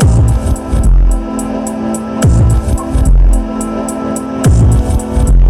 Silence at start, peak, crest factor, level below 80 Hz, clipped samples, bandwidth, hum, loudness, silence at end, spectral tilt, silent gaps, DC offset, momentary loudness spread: 0 s; 0 dBFS; 8 dB; -12 dBFS; under 0.1%; 13 kHz; none; -13 LUFS; 0 s; -7 dB/octave; none; under 0.1%; 8 LU